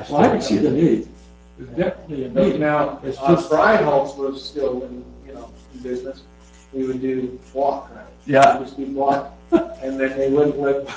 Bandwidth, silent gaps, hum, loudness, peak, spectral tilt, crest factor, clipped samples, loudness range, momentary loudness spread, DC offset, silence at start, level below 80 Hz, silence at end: 8 kHz; none; none; -20 LUFS; -2 dBFS; -6.5 dB/octave; 20 dB; under 0.1%; 8 LU; 20 LU; under 0.1%; 0 s; -48 dBFS; 0 s